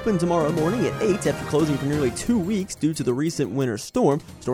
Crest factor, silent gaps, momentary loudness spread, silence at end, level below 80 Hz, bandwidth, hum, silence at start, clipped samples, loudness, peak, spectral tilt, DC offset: 16 dB; none; 4 LU; 0 s; -46 dBFS; 16.5 kHz; none; 0 s; under 0.1%; -23 LUFS; -6 dBFS; -6 dB/octave; under 0.1%